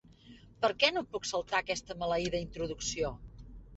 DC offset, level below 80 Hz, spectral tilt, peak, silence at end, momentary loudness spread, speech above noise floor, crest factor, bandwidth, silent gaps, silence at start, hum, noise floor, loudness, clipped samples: under 0.1%; -52 dBFS; -2 dB/octave; -10 dBFS; 0 s; 10 LU; 23 dB; 24 dB; 8 kHz; none; 0.1 s; none; -56 dBFS; -33 LUFS; under 0.1%